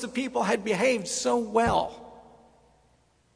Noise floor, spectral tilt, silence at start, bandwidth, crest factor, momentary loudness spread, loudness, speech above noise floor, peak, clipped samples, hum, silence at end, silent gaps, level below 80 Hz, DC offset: -65 dBFS; -4 dB/octave; 0 s; 11 kHz; 20 dB; 6 LU; -26 LUFS; 39 dB; -8 dBFS; under 0.1%; none; 1.15 s; none; -52 dBFS; under 0.1%